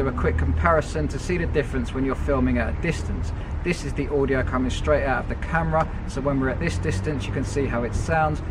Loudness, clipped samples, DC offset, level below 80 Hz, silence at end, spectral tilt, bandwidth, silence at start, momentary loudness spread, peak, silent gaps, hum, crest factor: -24 LUFS; under 0.1%; under 0.1%; -30 dBFS; 0 s; -6.5 dB/octave; 11 kHz; 0 s; 5 LU; -4 dBFS; none; none; 20 dB